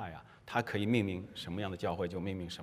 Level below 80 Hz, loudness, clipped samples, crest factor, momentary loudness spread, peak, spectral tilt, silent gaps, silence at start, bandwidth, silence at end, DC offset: -66 dBFS; -36 LUFS; under 0.1%; 22 dB; 10 LU; -16 dBFS; -6.5 dB/octave; none; 0 s; 15.5 kHz; 0 s; under 0.1%